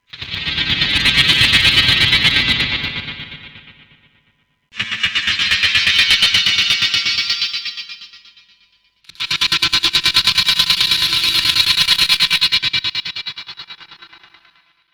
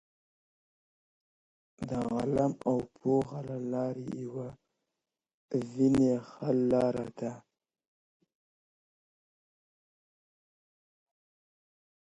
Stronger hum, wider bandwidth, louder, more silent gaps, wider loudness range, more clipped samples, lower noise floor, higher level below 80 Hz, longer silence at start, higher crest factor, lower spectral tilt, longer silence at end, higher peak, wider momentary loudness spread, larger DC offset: neither; first, over 20 kHz vs 11 kHz; first, -13 LUFS vs -31 LUFS; second, none vs 5.34-5.48 s; about the same, 6 LU vs 5 LU; neither; second, -62 dBFS vs -89 dBFS; first, -40 dBFS vs -64 dBFS; second, 0.15 s vs 1.8 s; about the same, 18 dB vs 18 dB; second, -1 dB/octave vs -8 dB/octave; second, 0.9 s vs 4.65 s; first, 0 dBFS vs -16 dBFS; first, 17 LU vs 13 LU; neither